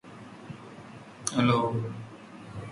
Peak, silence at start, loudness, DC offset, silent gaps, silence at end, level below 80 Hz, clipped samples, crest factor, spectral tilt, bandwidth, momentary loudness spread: -8 dBFS; 0.05 s; -28 LUFS; under 0.1%; none; 0 s; -62 dBFS; under 0.1%; 24 dB; -5.5 dB/octave; 11.5 kHz; 22 LU